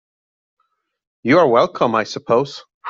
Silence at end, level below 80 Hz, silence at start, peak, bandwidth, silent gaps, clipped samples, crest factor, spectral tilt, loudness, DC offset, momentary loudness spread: 0 s; -62 dBFS; 1.25 s; -2 dBFS; 7.6 kHz; 2.74-2.81 s; under 0.1%; 16 dB; -6 dB/octave; -16 LUFS; under 0.1%; 11 LU